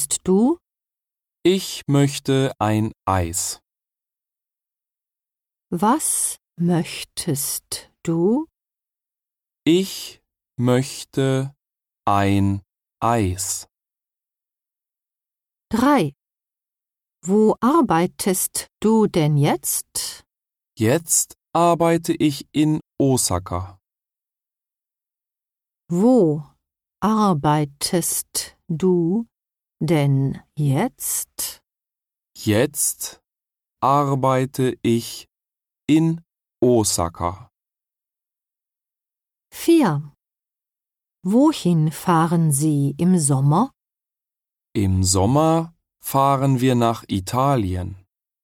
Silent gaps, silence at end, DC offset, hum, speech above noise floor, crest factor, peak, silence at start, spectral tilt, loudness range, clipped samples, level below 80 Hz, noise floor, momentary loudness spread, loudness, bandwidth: none; 0.45 s; under 0.1%; none; 71 dB; 16 dB; -6 dBFS; 0 s; -5.5 dB/octave; 5 LU; under 0.1%; -52 dBFS; -90 dBFS; 11 LU; -20 LUFS; 17 kHz